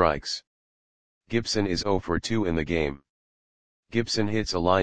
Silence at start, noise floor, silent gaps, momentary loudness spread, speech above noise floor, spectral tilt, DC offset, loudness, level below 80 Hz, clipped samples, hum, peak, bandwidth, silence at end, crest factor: 0 s; under -90 dBFS; 0.47-1.21 s, 3.10-3.83 s; 6 LU; over 64 dB; -5 dB/octave; 0.9%; -27 LUFS; -46 dBFS; under 0.1%; none; -4 dBFS; 10 kHz; 0 s; 22 dB